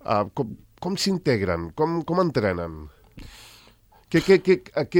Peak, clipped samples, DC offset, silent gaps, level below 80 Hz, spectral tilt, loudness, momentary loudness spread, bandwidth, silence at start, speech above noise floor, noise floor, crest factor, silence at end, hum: -6 dBFS; under 0.1%; under 0.1%; none; -52 dBFS; -6 dB/octave; -23 LUFS; 16 LU; 16.5 kHz; 0.05 s; 32 dB; -55 dBFS; 18 dB; 0 s; none